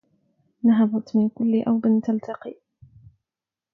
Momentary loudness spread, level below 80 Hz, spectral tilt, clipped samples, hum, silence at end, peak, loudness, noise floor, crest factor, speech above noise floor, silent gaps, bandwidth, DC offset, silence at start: 15 LU; -66 dBFS; -9.5 dB/octave; under 0.1%; none; 1.2 s; -10 dBFS; -22 LUFS; -90 dBFS; 14 dB; 69 dB; none; 5.6 kHz; under 0.1%; 0.65 s